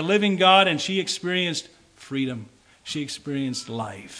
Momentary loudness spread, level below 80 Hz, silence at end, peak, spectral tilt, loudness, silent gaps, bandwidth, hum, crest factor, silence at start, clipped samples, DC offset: 16 LU; -66 dBFS; 0 s; -2 dBFS; -4 dB/octave; -23 LUFS; none; 10.5 kHz; none; 22 dB; 0 s; under 0.1%; under 0.1%